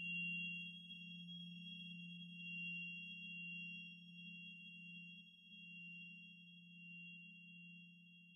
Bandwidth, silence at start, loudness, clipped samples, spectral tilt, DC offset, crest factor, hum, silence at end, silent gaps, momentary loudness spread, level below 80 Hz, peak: 10 kHz; 0 s; -51 LUFS; under 0.1%; -4 dB/octave; under 0.1%; 16 dB; none; 0 s; none; 13 LU; under -90 dBFS; -38 dBFS